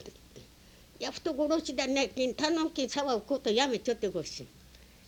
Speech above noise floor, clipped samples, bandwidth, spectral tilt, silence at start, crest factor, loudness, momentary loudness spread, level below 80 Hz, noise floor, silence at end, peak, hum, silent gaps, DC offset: 26 dB; under 0.1%; 19.5 kHz; -3 dB/octave; 0 s; 20 dB; -31 LUFS; 12 LU; -60 dBFS; -57 dBFS; 0.25 s; -14 dBFS; none; none; under 0.1%